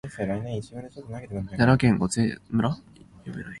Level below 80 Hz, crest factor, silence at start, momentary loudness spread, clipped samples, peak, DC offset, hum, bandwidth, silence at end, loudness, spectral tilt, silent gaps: -48 dBFS; 20 dB; 0.05 s; 19 LU; under 0.1%; -6 dBFS; under 0.1%; none; 11.5 kHz; 0 s; -25 LUFS; -6.5 dB/octave; none